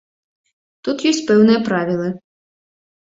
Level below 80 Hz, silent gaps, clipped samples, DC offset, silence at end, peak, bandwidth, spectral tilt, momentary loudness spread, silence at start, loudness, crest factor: -60 dBFS; none; under 0.1%; under 0.1%; 0.9 s; -2 dBFS; 7.8 kHz; -5.5 dB/octave; 14 LU; 0.85 s; -17 LUFS; 18 dB